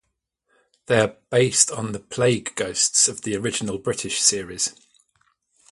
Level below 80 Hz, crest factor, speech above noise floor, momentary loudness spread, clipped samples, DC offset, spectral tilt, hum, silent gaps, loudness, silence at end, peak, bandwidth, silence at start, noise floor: -58 dBFS; 22 dB; 54 dB; 10 LU; under 0.1%; under 0.1%; -2.5 dB/octave; none; none; -21 LUFS; 1 s; -2 dBFS; 11.5 kHz; 0.9 s; -76 dBFS